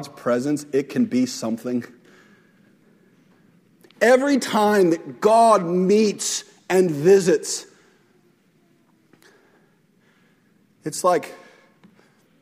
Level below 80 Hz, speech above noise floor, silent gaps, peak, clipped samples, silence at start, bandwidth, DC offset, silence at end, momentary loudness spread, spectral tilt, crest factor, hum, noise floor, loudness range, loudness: -70 dBFS; 41 dB; none; -4 dBFS; under 0.1%; 0 s; 16 kHz; under 0.1%; 1.05 s; 12 LU; -4.5 dB/octave; 18 dB; none; -60 dBFS; 11 LU; -20 LUFS